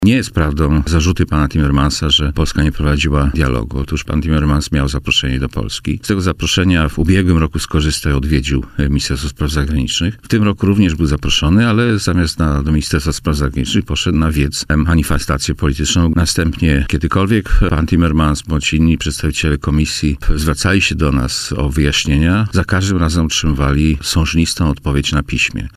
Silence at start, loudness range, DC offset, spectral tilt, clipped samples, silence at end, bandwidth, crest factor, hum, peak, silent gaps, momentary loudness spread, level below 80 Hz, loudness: 0 s; 2 LU; under 0.1%; -5 dB/octave; under 0.1%; 0.05 s; 15.5 kHz; 12 dB; none; -2 dBFS; none; 5 LU; -20 dBFS; -15 LUFS